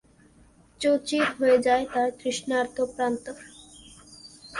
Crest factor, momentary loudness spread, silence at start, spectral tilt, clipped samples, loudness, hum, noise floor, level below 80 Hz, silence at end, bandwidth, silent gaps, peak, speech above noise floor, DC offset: 16 dB; 24 LU; 0.8 s; -3.5 dB/octave; under 0.1%; -25 LUFS; none; -57 dBFS; -60 dBFS; 0 s; 11.5 kHz; none; -10 dBFS; 32 dB; under 0.1%